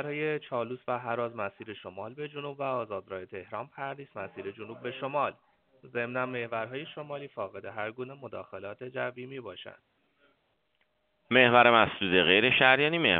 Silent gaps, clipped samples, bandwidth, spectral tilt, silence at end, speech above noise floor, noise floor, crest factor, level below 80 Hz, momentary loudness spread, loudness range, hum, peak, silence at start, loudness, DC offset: none; under 0.1%; 4.7 kHz; -1.5 dB/octave; 0 s; 45 dB; -75 dBFS; 26 dB; -70 dBFS; 21 LU; 15 LU; none; -6 dBFS; 0 s; -27 LUFS; under 0.1%